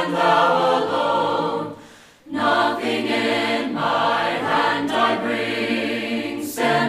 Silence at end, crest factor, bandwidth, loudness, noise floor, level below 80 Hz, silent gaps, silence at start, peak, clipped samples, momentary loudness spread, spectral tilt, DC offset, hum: 0 s; 16 dB; 15.5 kHz; -20 LUFS; -45 dBFS; -64 dBFS; none; 0 s; -4 dBFS; under 0.1%; 8 LU; -4.5 dB/octave; under 0.1%; none